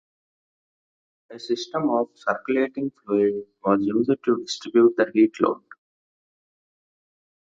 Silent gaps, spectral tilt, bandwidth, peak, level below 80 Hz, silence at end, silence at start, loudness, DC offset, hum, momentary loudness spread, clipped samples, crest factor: none; -5.5 dB/octave; 7.8 kHz; -2 dBFS; -70 dBFS; 1.95 s; 1.3 s; -23 LUFS; under 0.1%; none; 10 LU; under 0.1%; 22 dB